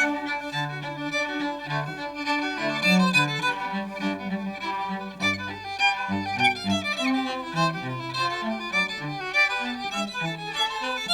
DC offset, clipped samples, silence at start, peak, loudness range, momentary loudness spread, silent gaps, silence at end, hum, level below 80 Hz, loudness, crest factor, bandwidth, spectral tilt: under 0.1%; under 0.1%; 0 s; -8 dBFS; 1 LU; 9 LU; none; 0 s; none; -60 dBFS; -26 LUFS; 20 dB; 16 kHz; -4 dB/octave